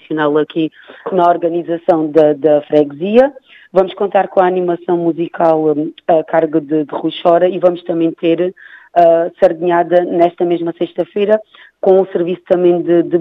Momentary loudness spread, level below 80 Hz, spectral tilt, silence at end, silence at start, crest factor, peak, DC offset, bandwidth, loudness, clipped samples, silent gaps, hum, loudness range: 7 LU; -60 dBFS; -8.5 dB/octave; 0 s; 0.1 s; 14 dB; 0 dBFS; under 0.1%; 4.9 kHz; -14 LUFS; under 0.1%; none; none; 1 LU